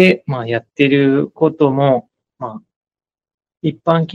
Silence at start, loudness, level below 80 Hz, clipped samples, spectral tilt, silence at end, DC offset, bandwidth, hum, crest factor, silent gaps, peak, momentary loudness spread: 0 s; -16 LUFS; -62 dBFS; under 0.1%; -8 dB/octave; 0 s; under 0.1%; 7.6 kHz; none; 16 dB; 2.76-2.81 s, 3.34-3.38 s; 0 dBFS; 16 LU